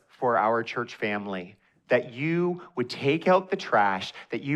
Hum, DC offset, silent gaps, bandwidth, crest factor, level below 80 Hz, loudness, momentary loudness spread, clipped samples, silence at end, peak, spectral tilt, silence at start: none; under 0.1%; none; 10.5 kHz; 18 dB; -74 dBFS; -26 LUFS; 11 LU; under 0.1%; 0 s; -10 dBFS; -6.5 dB/octave; 0.2 s